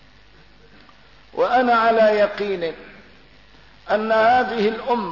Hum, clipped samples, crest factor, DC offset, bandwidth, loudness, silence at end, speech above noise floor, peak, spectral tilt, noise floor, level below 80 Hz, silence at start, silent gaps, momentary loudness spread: none; under 0.1%; 14 dB; 0.2%; 6 kHz; -19 LUFS; 0 s; 33 dB; -8 dBFS; -6 dB/octave; -51 dBFS; -56 dBFS; 1.35 s; none; 11 LU